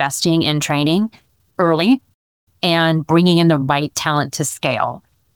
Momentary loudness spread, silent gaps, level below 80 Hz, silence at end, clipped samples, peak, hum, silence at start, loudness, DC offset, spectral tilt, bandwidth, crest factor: 8 LU; 2.14-2.47 s; -56 dBFS; 0.4 s; under 0.1%; -2 dBFS; none; 0 s; -17 LUFS; 0.1%; -5 dB/octave; 18.5 kHz; 14 dB